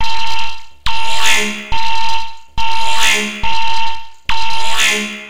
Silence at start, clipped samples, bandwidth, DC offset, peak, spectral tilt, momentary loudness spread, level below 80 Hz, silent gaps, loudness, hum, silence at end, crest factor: 0 s; under 0.1%; 16.5 kHz; 30%; 0 dBFS; -1 dB/octave; 10 LU; -34 dBFS; none; -16 LUFS; none; 0 s; 12 dB